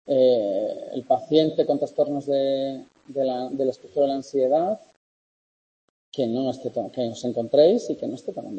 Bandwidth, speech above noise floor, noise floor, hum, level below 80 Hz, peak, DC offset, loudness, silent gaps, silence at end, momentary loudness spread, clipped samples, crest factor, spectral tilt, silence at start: 8.6 kHz; over 67 dB; under -90 dBFS; none; -72 dBFS; -6 dBFS; under 0.1%; -24 LUFS; 4.96-6.12 s; 0 s; 12 LU; under 0.1%; 18 dB; -6.5 dB/octave; 0.05 s